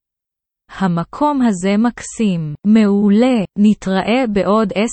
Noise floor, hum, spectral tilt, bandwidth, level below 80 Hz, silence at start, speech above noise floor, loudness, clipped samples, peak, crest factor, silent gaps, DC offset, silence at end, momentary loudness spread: -83 dBFS; none; -6.5 dB/octave; 8.8 kHz; -46 dBFS; 0.7 s; 69 dB; -15 LUFS; under 0.1%; -2 dBFS; 14 dB; none; under 0.1%; 0 s; 7 LU